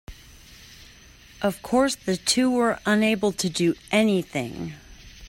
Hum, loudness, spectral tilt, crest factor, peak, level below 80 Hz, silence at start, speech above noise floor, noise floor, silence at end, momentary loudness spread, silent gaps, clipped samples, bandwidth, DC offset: none; -23 LUFS; -4 dB/octave; 18 dB; -6 dBFS; -52 dBFS; 0.1 s; 27 dB; -49 dBFS; 0 s; 11 LU; none; under 0.1%; 16.5 kHz; under 0.1%